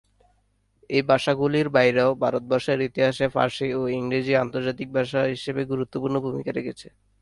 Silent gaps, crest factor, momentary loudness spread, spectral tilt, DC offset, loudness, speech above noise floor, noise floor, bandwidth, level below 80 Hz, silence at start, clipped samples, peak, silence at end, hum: none; 18 dB; 9 LU; -6.5 dB/octave; under 0.1%; -24 LUFS; 43 dB; -67 dBFS; 11.5 kHz; -58 dBFS; 0.9 s; under 0.1%; -6 dBFS; 0.35 s; none